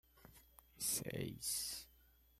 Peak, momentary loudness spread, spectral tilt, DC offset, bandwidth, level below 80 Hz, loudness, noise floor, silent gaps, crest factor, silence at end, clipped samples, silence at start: -26 dBFS; 22 LU; -2.5 dB/octave; under 0.1%; 16 kHz; -68 dBFS; -42 LUFS; -70 dBFS; none; 20 dB; 0.5 s; under 0.1%; 0.15 s